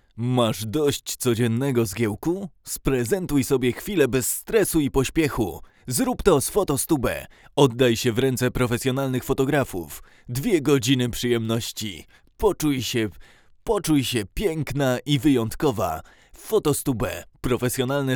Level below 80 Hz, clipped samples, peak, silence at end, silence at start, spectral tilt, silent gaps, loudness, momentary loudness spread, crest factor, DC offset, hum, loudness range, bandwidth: -42 dBFS; under 0.1%; -2 dBFS; 0 s; 0.15 s; -5 dB/octave; none; -23 LUFS; 9 LU; 20 dB; under 0.1%; none; 2 LU; over 20 kHz